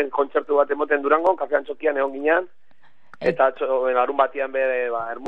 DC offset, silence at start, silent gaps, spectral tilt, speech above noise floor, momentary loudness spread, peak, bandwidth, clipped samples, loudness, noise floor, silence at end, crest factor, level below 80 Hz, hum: 0.9%; 0 s; none; -7 dB/octave; 40 dB; 5 LU; -4 dBFS; 5.4 kHz; under 0.1%; -21 LUFS; -61 dBFS; 0 s; 18 dB; -68 dBFS; none